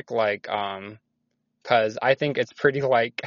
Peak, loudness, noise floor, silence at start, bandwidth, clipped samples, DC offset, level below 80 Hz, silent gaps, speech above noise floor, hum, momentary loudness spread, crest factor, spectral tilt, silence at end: -4 dBFS; -24 LUFS; -75 dBFS; 0.1 s; 7.2 kHz; under 0.1%; under 0.1%; -68 dBFS; none; 52 dB; none; 14 LU; 22 dB; -3 dB/octave; 0 s